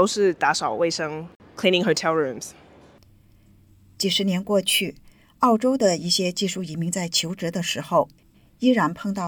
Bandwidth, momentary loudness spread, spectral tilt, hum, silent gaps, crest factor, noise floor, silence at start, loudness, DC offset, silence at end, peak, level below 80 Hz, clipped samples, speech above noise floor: over 20 kHz; 9 LU; -4 dB/octave; none; 1.36-1.40 s; 18 dB; -54 dBFS; 0 s; -22 LUFS; under 0.1%; 0 s; -4 dBFS; -60 dBFS; under 0.1%; 32 dB